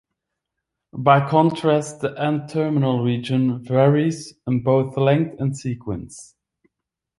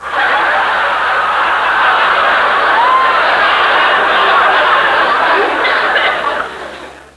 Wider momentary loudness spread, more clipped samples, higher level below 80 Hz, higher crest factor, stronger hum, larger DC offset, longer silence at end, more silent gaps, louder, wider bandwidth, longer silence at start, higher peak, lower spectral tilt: first, 13 LU vs 5 LU; neither; second, -56 dBFS vs -46 dBFS; first, 20 dB vs 12 dB; neither; neither; first, 0.95 s vs 0.15 s; neither; second, -20 LUFS vs -10 LUFS; about the same, 11.5 kHz vs 11 kHz; first, 0.95 s vs 0 s; about the same, -2 dBFS vs 0 dBFS; first, -7 dB/octave vs -2.5 dB/octave